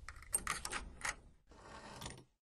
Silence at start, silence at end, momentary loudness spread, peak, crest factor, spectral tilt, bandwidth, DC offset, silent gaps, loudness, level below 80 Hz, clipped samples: 0 s; 0.15 s; 18 LU; -20 dBFS; 26 dB; -1 dB/octave; 13 kHz; under 0.1%; none; -42 LUFS; -58 dBFS; under 0.1%